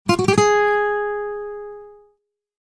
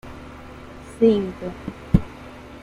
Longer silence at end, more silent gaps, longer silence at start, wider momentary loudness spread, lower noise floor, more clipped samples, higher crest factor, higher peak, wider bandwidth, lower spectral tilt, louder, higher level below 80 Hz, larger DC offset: first, 0.7 s vs 0.05 s; neither; about the same, 0.05 s vs 0.05 s; about the same, 20 LU vs 22 LU; first, -66 dBFS vs -40 dBFS; neither; about the same, 18 dB vs 22 dB; about the same, -2 dBFS vs -2 dBFS; about the same, 11 kHz vs 11.5 kHz; second, -4.5 dB/octave vs -8.5 dB/octave; first, -19 LUFS vs -22 LUFS; second, -50 dBFS vs -36 dBFS; neither